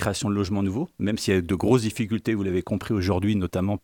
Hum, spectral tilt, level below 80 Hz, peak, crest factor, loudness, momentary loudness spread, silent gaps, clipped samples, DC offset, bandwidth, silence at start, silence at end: none; -6 dB/octave; -48 dBFS; -8 dBFS; 16 dB; -25 LUFS; 5 LU; none; under 0.1%; under 0.1%; 18.5 kHz; 0 s; 0.05 s